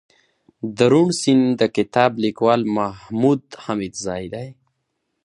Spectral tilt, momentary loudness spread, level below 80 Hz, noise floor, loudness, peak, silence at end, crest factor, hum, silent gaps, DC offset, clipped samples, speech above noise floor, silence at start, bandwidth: -5.5 dB/octave; 15 LU; -56 dBFS; -74 dBFS; -19 LUFS; 0 dBFS; 0.75 s; 20 dB; none; none; under 0.1%; under 0.1%; 55 dB; 0.65 s; 11 kHz